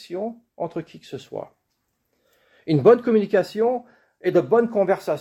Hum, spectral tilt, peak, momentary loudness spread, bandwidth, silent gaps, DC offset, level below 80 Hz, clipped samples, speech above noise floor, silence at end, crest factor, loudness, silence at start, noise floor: none; -8 dB/octave; -4 dBFS; 20 LU; 13 kHz; none; under 0.1%; -68 dBFS; under 0.1%; 53 dB; 0 s; 20 dB; -21 LUFS; 0 s; -74 dBFS